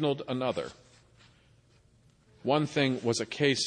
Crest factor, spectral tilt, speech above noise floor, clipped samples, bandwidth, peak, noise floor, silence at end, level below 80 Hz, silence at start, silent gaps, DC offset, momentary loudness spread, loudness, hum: 20 dB; -4.5 dB/octave; 34 dB; under 0.1%; 10 kHz; -12 dBFS; -63 dBFS; 0 s; -68 dBFS; 0 s; none; under 0.1%; 10 LU; -30 LUFS; none